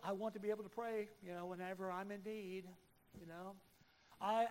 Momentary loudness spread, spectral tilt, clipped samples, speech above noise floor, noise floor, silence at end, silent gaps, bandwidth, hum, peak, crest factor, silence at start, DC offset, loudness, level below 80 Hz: 15 LU; -6 dB/octave; under 0.1%; 24 dB; -69 dBFS; 0 s; none; 16 kHz; none; -26 dBFS; 20 dB; 0 s; under 0.1%; -46 LUFS; -80 dBFS